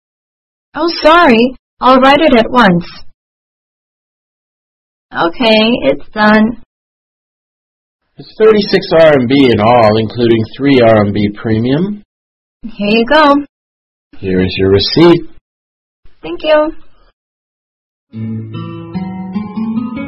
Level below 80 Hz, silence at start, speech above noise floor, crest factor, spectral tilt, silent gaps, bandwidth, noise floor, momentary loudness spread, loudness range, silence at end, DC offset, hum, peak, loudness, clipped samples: -38 dBFS; 0.75 s; over 81 dB; 12 dB; -7.5 dB/octave; 1.59-1.77 s, 3.14-5.09 s, 6.66-7.99 s, 12.05-12.60 s, 13.49-14.11 s, 15.41-16.03 s, 17.13-18.07 s; 8.8 kHz; under -90 dBFS; 16 LU; 10 LU; 0 s; under 0.1%; none; 0 dBFS; -10 LUFS; 0.4%